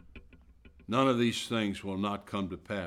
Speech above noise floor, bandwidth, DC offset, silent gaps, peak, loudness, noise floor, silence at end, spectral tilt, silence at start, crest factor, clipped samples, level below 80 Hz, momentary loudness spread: 26 dB; 15.5 kHz; under 0.1%; none; -14 dBFS; -31 LUFS; -57 dBFS; 0 s; -5.5 dB/octave; 0.15 s; 18 dB; under 0.1%; -60 dBFS; 10 LU